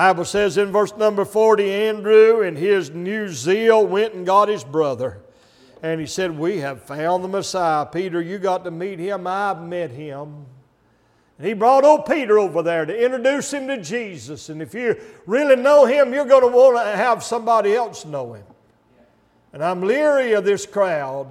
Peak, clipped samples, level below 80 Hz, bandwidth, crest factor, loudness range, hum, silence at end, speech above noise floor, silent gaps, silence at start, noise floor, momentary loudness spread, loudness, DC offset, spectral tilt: 0 dBFS; under 0.1%; -62 dBFS; 14 kHz; 18 dB; 8 LU; none; 0 s; 41 dB; none; 0 s; -59 dBFS; 15 LU; -18 LUFS; under 0.1%; -5 dB/octave